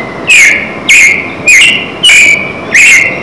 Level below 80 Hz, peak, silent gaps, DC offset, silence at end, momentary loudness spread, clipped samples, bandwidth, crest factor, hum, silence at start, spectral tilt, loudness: -40 dBFS; 0 dBFS; none; under 0.1%; 0 s; 7 LU; 9%; 11 kHz; 6 dB; none; 0 s; 0 dB/octave; -2 LUFS